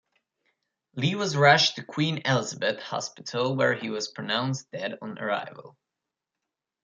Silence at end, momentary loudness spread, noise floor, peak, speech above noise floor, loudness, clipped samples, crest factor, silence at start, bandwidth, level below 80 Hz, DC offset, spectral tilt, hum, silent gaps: 1.15 s; 14 LU; -87 dBFS; -4 dBFS; 60 dB; -26 LUFS; under 0.1%; 24 dB; 0.95 s; 9.2 kHz; -70 dBFS; under 0.1%; -4 dB/octave; none; none